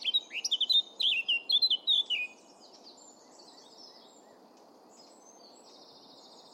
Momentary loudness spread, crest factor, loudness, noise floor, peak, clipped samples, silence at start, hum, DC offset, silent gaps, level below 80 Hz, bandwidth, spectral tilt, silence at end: 7 LU; 16 dB; -27 LUFS; -57 dBFS; -18 dBFS; under 0.1%; 0 s; none; under 0.1%; none; under -90 dBFS; 16 kHz; 2.5 dB/octave; 2.65 s